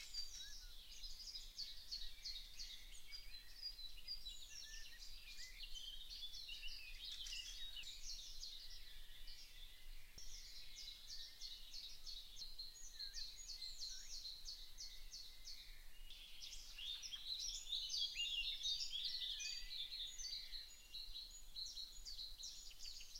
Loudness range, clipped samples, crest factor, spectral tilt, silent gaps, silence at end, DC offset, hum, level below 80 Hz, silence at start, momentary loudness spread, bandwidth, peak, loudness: 10 LU; under 0.1%; 20 dB; 1.5 dB/octave; none; 0 s; under 0.1%; none; -60 dBFS; 0 s; 13 LU; 16 kHz; -30 dBFS; -49 LUFS